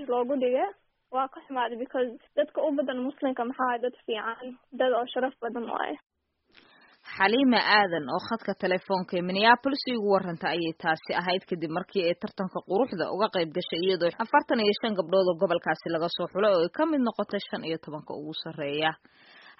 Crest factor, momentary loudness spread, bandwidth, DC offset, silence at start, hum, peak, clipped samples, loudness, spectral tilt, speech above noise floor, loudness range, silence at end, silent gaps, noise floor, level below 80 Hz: 22 dB; 11 LU; 5.8 kHz; under 0.1%; 0 s; none; -4 dBFS; under 0.1%; -27 LUFS; -2.5 dB/octave; 35 dB; 5 LU; 0.1 s; none; -63 dBFS; -72 dBFS